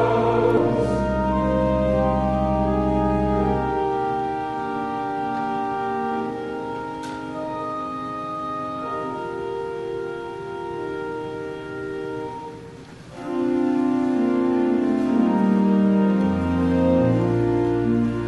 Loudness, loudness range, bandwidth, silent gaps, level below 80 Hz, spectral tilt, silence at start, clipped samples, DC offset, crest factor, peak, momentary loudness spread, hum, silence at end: -23 LUFS; 10 LU; 11 kHz; none; -38 dBFS; -8.5 dB/octave; 0 s; under 0.1%; under 0.1%; 16 dB; -6 dBFS; 12 LU; none; 0 s